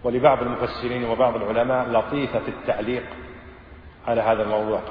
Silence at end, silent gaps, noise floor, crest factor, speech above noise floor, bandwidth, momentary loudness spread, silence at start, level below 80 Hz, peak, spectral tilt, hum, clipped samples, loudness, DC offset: 0 s; none; -44 dBFS; 20 dB; 22 dB; 5.2 kHz; 14 LU; 0 s; -46 dBFS; -4 dBFS; -9 dB/octave; none; under 0.1%; -23 LUFS; under 0.1%